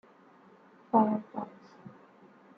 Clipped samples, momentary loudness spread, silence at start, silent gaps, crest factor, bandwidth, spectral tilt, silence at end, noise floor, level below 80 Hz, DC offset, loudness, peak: under 0.1%; 26 LU; 0.95 s; none; 22 dB; 5.2 kHz; -10 dB/octave; 0.7 s; -59 dBFS; -82 dBFS; under 0.1%; -30 LUFS; -12 dBFS